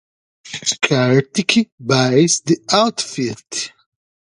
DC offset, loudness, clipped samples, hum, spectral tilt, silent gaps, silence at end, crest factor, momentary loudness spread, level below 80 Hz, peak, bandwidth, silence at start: under 0.1%; -16 LUFS; under 0.1%; none; -4 dB/octave; 1.72-1.78 s; 0.65 s; 18 dB; 11 LU; -58 dBFS; 0 dBFS; 11.5 kHz; 0.45 s